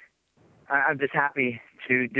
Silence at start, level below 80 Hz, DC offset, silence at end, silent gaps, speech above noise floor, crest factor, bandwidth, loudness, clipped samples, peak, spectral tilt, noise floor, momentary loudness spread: 0.7 s; -72 dBFS; under 0.1%; 0 s; none; 37 dB; 20 dB; 4 kHz; -25 LUFS; under 0.1%; -8 dBFS; -8 dB/octave; -62 dBFS; 5 LU